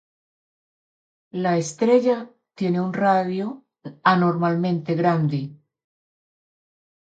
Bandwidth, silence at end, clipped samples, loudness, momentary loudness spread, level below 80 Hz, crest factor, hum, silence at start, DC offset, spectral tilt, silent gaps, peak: 9 kHz; 1.55 s; under 0.1%; -22 LUFS; 15 LU; -70 dBFS; 22 dB; none; 1.35 s; under 0.1%; -7 dB/octave; none; -2 dBFS